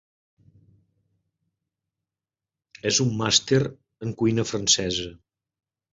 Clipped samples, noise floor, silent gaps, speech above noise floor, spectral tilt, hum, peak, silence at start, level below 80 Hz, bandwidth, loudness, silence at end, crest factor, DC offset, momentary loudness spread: under 0.1%; under -90 dBFS; none; over 67 dB; -3.5 dB/octave; none; -4 dBFS; 2.85 s; -56 dBFS; 8 kHz; -22 LUFS; 0.8 s; 24 dB; under 0.1%; 14 LU